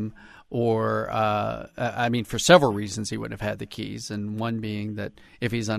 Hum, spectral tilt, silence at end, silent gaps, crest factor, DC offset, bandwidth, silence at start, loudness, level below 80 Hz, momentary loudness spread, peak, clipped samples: none; -5 dB/octave; 0 s; none; 24 dB; under 0.1%; 13.5 kHz; 0 s; -25 LUFS; -54 dBFS; 16 LU; -2 dBFS; under 0.1%